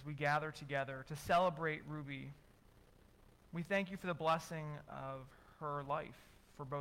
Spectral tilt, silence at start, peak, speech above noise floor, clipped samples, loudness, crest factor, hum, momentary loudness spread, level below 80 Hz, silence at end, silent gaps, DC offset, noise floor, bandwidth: -5.5 dB/octave; 0 s; -24 dBFS; 25 dB; under 0.1%; -40 LUFS; 16 dB; none; 14 LU; -66 dBFS; 0 s; none; under 0.1%; -66 dBFS; 16.5 kHz